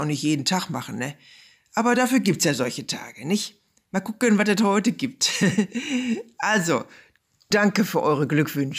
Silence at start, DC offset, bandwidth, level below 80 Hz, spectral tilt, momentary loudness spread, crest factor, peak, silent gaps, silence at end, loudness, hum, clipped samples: 0 s; under 0.1%; 15.5 kHz; -68 dBFS; -4.5 dB/octave; 11 LU; 14 dB; -8 dBFS; none; 0 s; -23 LUFS; none; under 0.1%